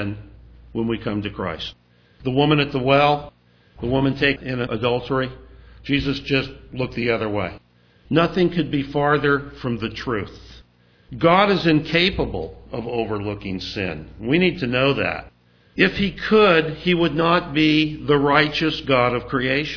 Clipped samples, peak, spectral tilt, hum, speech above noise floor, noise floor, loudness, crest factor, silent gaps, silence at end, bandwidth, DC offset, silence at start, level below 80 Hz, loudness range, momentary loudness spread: under 0.1%; 0 dBFS; -7 dB/octave; none; 33 dB; -53 dBFS; -20 LUFS; 20 dB; none; 0 s; 5.4 kHz; under 0.1%; 0 s; -44 dBFS; 5 LU; 14 LU